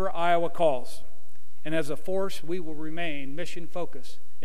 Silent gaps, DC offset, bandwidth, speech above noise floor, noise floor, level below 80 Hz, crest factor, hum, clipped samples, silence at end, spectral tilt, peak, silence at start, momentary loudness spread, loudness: none; 10%; 15.5 kHz; 32 dB; -62 dBFS; -64 dBFS; 20 dB; none; under 0.1%; 0.3 s; -5.5 dB/octave; -10 dBFS; 0 s; 18 LU; -30 LUFS